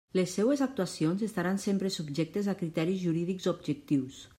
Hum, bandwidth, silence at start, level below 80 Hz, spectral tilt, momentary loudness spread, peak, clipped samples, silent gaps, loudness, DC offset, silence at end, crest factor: none; 16 kHz; 0.15 s; -68 dBFS; -6 dB/octave; 4 LU; -16 dBFS; under 0.1%; none; -31 LUFS; under 0.1%; 0.15 s; 14 dB